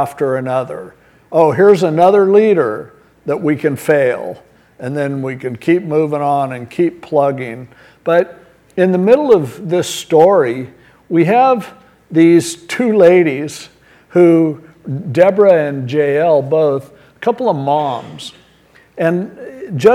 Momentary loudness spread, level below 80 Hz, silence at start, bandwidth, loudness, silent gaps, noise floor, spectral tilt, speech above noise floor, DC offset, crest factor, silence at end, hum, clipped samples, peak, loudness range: 16 LU; -58 dBFS; 0 s; 15 kHz; -13 LUFS; none; -48 dBFS; -6.5 dB/octave; 35 dB; under 0.1%; 14 dB; 0 s; none; under 0.1%; 0 dBFS; 5 LU